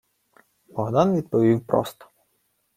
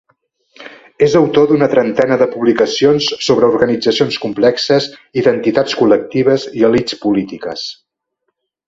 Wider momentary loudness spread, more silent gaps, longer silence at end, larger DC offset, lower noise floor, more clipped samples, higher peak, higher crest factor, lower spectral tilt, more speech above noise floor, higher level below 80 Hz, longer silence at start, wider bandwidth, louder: first, 13 LU vs 6 LU; neither; about the same, 0.85 s vs 0.95 s; neither; about the same, -70 dBFS vs -71 dBFS; neither; second, -4 dBFS vs 0 dBFS; first, 20 dB vs 14 dB; first, -8 dB/octave vs -5.5 dB/octave; second, 49 dB vs 59 dB; second, -60 dBFS vs -52 dBFS; first, 0.75 s vs 0.6 s; first, 15.5 kHz vs 7.8 kHz; second, -22 LUFS vs -13 LUFS